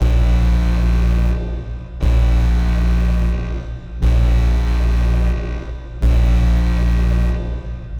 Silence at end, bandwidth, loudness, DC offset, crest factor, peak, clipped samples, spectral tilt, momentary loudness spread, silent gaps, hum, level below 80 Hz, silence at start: 0 s; 7 kHz; -18 LUFS; under 0.1%; 10 dB; -4 dBFS; under 0.1%; -7.5 dB/octave; 11 LU; none; none; -16 dBFS; 0 s